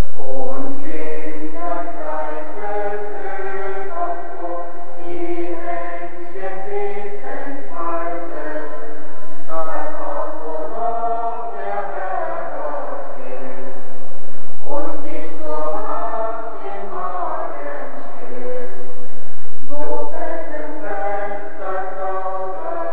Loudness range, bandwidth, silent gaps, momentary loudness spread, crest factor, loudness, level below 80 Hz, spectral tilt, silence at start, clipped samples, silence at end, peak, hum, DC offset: 4 LU; 6 kHz; none; 10 LU; 10 dB; -27 LUFS; -58 dBFS; -9.5 dB/octave; 0 s; under 0.1%; 0 s; 0 dBFS; none; 30%